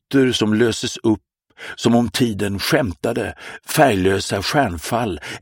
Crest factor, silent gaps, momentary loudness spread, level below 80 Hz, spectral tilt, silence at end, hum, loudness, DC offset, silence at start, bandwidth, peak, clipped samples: 18 dB; none; 9 LU; -46 dBFS; -5 dB/octave; 0.05 s; none; -19 LUFS; under 0.1%; 0.1 s; 17 kHz; 0 dBFS; under 0.1%